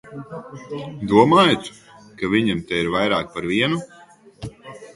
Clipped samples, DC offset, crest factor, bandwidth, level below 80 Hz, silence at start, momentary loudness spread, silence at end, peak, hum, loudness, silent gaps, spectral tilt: under 0.1%; under 0.1%; 20 dB; 11.5 kHz; -52 dBFS; 0.05 s; 23 LU; 0.05 s; 0 dBFS; none; -19 LUFS; none; -5.5 dB/octave